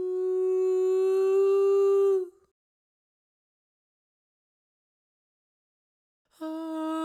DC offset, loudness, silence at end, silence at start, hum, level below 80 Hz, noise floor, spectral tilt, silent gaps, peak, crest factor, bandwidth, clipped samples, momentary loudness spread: under 0.1%; -25 LUFS; 0 s; 0 s; none; under -90 dBFS; under -90 dBFS; -4 dB/octave; 2.51-6.25 s; -18 dBFS; 12 dB; 9 kHz; under 0.1%; 14 LU